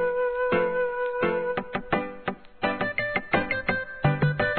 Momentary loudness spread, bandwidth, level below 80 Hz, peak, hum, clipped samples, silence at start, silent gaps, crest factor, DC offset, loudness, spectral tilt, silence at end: 6 LU; 4.5 kHz; -50 dBFS; -8 dBFS; none; under 0.1%; 0 s; none; 18 dB; 0.3%; -27 LUFS; -10 dB/octave; 0 s